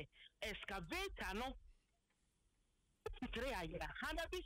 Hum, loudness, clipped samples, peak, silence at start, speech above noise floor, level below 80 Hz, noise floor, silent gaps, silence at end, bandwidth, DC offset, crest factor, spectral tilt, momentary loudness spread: none; -47 LUFS; under 0.1%; -34 dBFS; 0 s; 36 dB; -58 dBFS; -82 dBFS; none; 0 s; 16 kHz; under 0.1%; 14 dB; -4 dB/octave; 10 LU